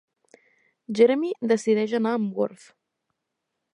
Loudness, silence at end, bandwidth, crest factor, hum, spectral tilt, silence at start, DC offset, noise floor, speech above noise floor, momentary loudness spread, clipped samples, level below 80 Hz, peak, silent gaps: -23 LUFS; 1.2 s; 10.5 kHz; 20 dB; none; -6 dB/octave; 0.9 s; under 0.1%; -81 dBFS; 59 dB; 9 LU; under 0.1%; -80 dBFS; -6 dBFS; none